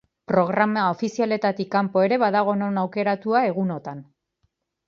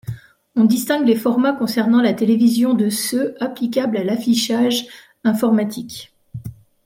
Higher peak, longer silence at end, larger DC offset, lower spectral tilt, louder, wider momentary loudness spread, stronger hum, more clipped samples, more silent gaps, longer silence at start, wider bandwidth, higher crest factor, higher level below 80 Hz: about the same, -4 dBFS vs -4 dBFS; first, 0.85 s vs 0.3 s; neither; first, -7 dB/octave vs -5 dB/octave; second, -22 LUFS vs -18 LUFS; second, 7 LU vs 19 LU; neither; neither; neither; first, 0.3 s vs 0.05 s; second, 7.2 kHz vs 16.5 kHz; about the same, 18 dB vs 14 dB; second, -68 dBFS vs -58 dBFS